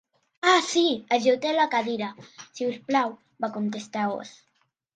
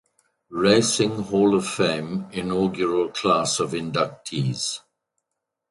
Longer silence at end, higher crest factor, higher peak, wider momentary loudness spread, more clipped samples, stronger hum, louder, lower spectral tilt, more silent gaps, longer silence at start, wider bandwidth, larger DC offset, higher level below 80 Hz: second, 0.65 s vs 0.9 s; about the same, 20 dB vs 20 dB; second, -6 dBFS vs -2 dBFS; first, 14 LU vs 10 LU; neither; neither; second, -25 LUFS vs -22 LUFS; about the same, -3.5 dB/octave vs -4.5 dB/octave; neither; about the same, 0.45 s vs 0.5 s; second, 9.4 kHz vs 11.5 kHz; neither; second, -76 dBFS vs -58 dBFS